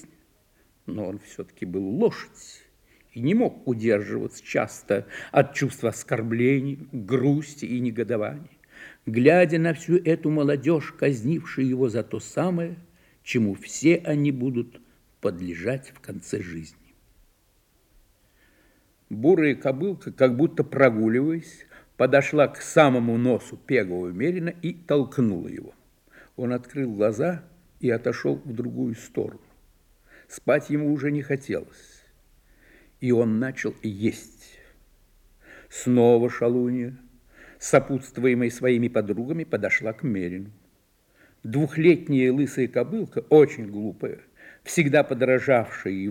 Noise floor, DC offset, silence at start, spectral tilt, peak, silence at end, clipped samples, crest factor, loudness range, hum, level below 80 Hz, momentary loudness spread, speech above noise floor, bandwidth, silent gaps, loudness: -64 dBFS; under 0.1%; 0.85 s; -6.5 dB/octave; -2 dBFS; 0 s; under 0.1%; 22 dB; 6 LU; none; -62 dBFS; 15 LU; 40 dB; 16.5 kHz; none; -24 LUFS